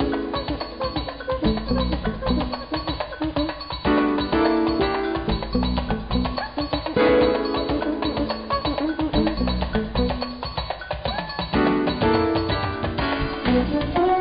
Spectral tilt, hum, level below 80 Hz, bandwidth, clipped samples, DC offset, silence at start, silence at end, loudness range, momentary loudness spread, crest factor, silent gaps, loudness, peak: -11 dB/octave; none; -32 dBFS; 5.2 kHz; under 0.1%; under 0.1%; 0 s; 0 s; 3 LU; 7 LU; 12 dB; none; -23 LUFS; -10 dBFS